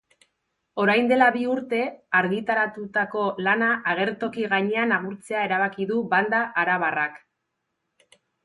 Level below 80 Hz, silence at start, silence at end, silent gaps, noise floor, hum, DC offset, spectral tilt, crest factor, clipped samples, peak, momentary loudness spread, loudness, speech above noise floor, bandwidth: -70 dBFS; 0.75 s; 1.25 s; none; -79 dBFS; none; under 0.1%; -6 dB/octave; 18 dB; under 0.1%; -6 dBFS; 7 LU; -23 LUFS; 55 dB; 11.5 kHz